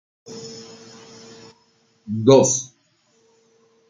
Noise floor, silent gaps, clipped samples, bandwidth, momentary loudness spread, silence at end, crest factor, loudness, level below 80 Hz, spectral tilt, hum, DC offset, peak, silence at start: -62 dBFS; none; under 0.1%; 9.6 kHz; 28 LU; 1.25 s; 22 dB; -17 LUFS; -66 dBFS; -5 dB/octave; none; under 0.1%; -2 dBFS; 0.3 s